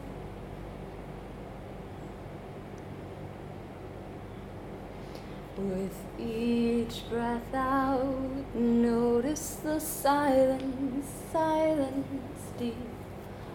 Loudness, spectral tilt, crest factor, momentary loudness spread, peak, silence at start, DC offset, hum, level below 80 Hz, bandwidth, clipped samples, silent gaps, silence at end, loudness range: -30 LUFS; -5.5 dB/octave; 18 dB; 17 LU; -14 dBFS; 0 s; under 0.1%; none; -50 dBFS; 19 kHz; under 0.1%; none; 0 s; 15 LU